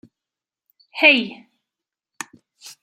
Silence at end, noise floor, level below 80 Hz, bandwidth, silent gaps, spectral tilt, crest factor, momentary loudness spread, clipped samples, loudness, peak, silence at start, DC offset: 0.1 s; -88 dBFS; -78 dBFS; 15.5 kHz; none; -2 dB/octave; 22 dB; 23 LU; under 0.1%; -15 LUFS; -2 dBFS; 0.95 s; under 0.1%